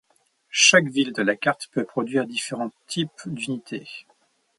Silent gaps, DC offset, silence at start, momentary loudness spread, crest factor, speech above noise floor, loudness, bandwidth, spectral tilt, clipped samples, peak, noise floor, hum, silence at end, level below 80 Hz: none; under 0.1%; 0.55 s; 18 LU; 22 dB; 39 dB; -22 LUFS; 11.5 kHz; -2.5 dB/octave; under 0.1%; -2 dBFS; -62 dBFS; none; 0.6 s; -72 dBFS